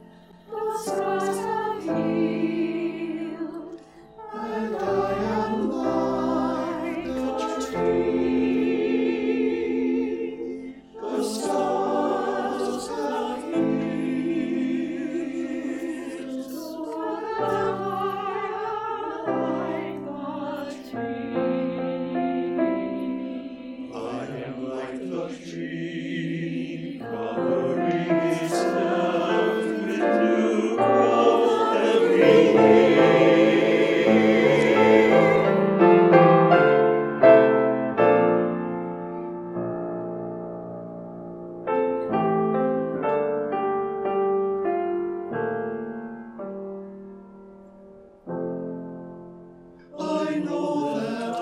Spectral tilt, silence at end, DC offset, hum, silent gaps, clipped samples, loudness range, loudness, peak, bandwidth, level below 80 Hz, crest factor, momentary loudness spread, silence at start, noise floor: -6.5 dB/octave; 0 s; under 0.1%; none; none; under 0.1%; 14 LU; -23 LUFS; -2 dBFS; 14 kHz; -60 dBFS; 22 dB; 17 LU; 0.5 s; -49 dBFS